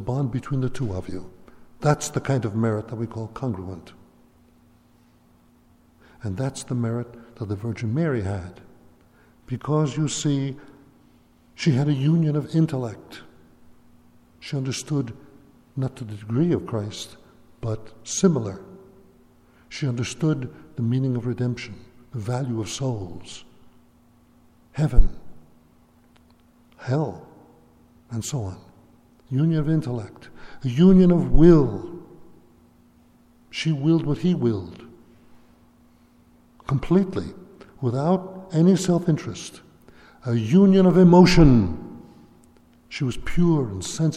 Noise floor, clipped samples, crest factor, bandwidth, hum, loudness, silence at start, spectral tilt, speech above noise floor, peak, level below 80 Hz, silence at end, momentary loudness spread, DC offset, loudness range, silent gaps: -57 dBFS; under 0.1%; 22 dB; 12.5 kHz; none; -22 LUFS; 0 s; -7 dB/octave; 36 dB; 0 dBFS; -34 dBFS; 0 s; 21 LU; under 0.1%; 14 LU; none